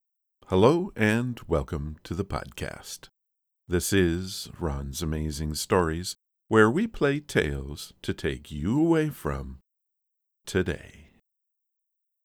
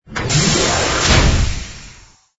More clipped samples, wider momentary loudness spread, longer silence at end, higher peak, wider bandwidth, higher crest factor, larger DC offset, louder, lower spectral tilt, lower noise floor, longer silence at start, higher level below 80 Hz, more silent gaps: neither; first, 15 LU vs 12 LU; first, 1.25 s vs 0.45 s; second, -4 dBFS vs 0 dBFS; first, 18.5 kHz vs 8 kHz; first, 24 dB vs 16 dB; neither; second, -27 LUFS vs -14 LUFS; first, -5.5 dB/octave vs -3.5 dB/octave; first, -81 dBFS vs -43 dBFS; first, 0.5 s vs 0.1 s; second, -42 dBFS vs -22 dBFS; neither